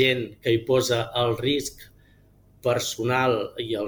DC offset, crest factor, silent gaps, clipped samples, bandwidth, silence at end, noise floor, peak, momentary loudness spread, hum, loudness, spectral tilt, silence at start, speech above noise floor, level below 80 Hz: under 0.1%; 18 dB; none; under 0.1%; over 20 kHz; 0 s; -56 dBFS; -8 dBFS; 6 LU; none; -24 LUFS; -4.5 dB/octave; 0 s; 32 dB; -54 dBFS